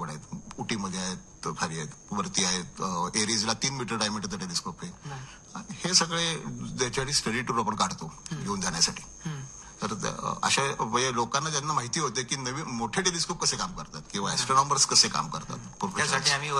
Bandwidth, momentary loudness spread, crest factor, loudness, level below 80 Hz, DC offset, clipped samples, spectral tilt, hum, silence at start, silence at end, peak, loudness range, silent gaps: 13 kHz; 15 LU; 22 dB; -27 LUFS; -54 dBFS; under 0.1%; under 0.1%; -2.5 dB/octave; none; 0 s; 0 s; -8 dBFS; 4 LU; none